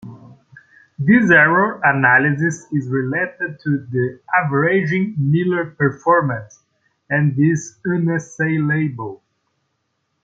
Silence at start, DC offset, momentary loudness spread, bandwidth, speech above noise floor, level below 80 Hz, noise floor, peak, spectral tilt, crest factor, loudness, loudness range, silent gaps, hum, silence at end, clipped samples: 0.05 s; under 0.1%; 10 LU; 7.8 kHz; 54 dB; -60 dBFS; -71 dBFS; -2 dBFS; -7.5 dB/octave; 16 dB; -17 LUFS; 5 LU; none; none; 1.1 s; under 0.1%